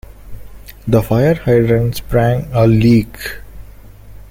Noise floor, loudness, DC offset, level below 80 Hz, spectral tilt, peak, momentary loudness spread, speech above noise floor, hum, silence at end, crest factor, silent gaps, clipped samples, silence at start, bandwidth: -36 dBFS; -14 LUFS; under 0.1%; -32 dBFS; -8 dB/octave; -2 dBFS; 16 LU; 23 dB; none; 0.15 s; 14 dB; none; under 0.1%; 0.25 s; 16.5 kHz